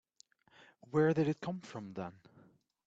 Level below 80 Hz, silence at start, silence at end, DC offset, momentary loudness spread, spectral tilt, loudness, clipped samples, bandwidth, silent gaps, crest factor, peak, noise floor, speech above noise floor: -74 dBFS; 0.9 s; 0.75 s; under 0.1%; 15 LU; -8 dB/octave; -35 LUFS; under 0.1%; 8 kHz; none; 18 dB; -20 dBFS; -68 dBFS; 34 dB